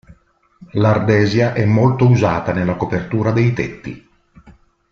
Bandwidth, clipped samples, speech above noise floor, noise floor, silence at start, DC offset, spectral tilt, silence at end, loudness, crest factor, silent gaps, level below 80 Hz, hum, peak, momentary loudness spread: 6.8 kHz; under 0.1%; 39 dB; -54 dBFS; 0.6 s; under 0.1%; -8 dB/octave; 0.4 s; -16 LUFS; 14 dB; none; -44 dBFS; none; -2 dBFS; 11 LU